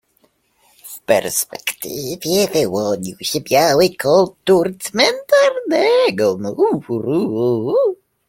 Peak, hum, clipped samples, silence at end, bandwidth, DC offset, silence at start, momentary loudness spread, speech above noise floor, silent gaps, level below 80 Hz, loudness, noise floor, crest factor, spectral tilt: 0 dBFS; none; under 0.1%; 0.35 s; 16.5 kHz; under 0.1%; 0.85 s; 9 LU; 44 dB; none; -56 dBFS; -17 LUFS; -60 dBFS; 16 dB; -4 dB/octave